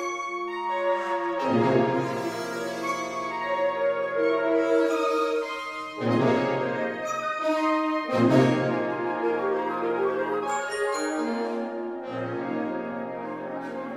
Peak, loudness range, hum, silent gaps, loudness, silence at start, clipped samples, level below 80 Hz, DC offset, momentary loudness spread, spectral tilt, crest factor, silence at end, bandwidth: -8 dBFS; 4 LU; none; none; -26 LUFS; 0 s; under 0.1%; -68 dBFS; under 0.1%; 10 LU; -6 dB/octave; 18 dB; 0 s; 14.5 kHz